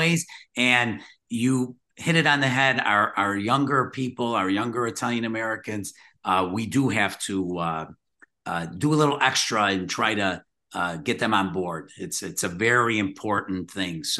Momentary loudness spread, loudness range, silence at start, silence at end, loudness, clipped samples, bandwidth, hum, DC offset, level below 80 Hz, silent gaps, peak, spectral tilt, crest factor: 12 LU; 4 LU; 0 s; 0 s; -24 LUFS; under 0.1%; 12.5 kHz; none; under 0.1%; -64 dBFS; none; -4 dBFS; -4 dB/octave; 20 dB